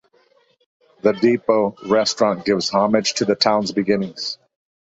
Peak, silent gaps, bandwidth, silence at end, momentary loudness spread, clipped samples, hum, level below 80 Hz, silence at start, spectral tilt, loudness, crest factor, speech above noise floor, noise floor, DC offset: -2 dBFS; none; 8.2 kHz; 0.6 s; 7 LU; under 0.1%; none; -60 dBFS; 1.05 s; -4 dB/octave; -19 LUFS; 18 dB; 40 dB; -59 dBFS; under 0.1%